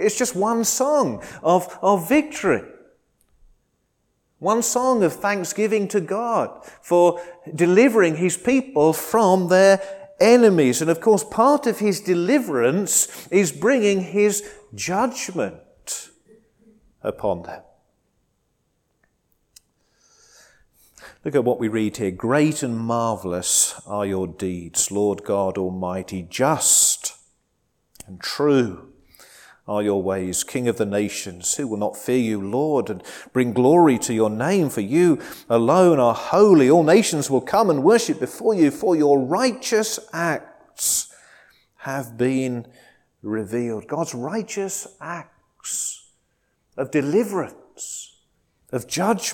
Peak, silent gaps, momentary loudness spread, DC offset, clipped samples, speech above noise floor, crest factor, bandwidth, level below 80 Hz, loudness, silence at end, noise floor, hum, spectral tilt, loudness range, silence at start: -2 dBFS; none; 15 LU; under 0.1%; under 0.1%; 50 dB; 18 dB; 19 kHz; -60 dBFS; -20 LUFS; 0 s; -70 dBFS; none; -4.5 dB/octave; 11 LU; 0 s